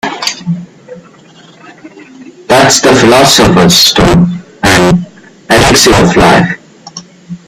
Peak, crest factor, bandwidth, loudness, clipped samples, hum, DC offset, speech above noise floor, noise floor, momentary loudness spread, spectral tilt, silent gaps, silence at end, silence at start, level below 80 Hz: 0 dBFS; 8 dB; over 20 kHz; -6 LUFS; 0.7%; none; under 0.1%; 32 dB; -37 dBFS; 16 LU; -4 dB/octave; none; 0.1 s; 0.05 s; -28 dBFS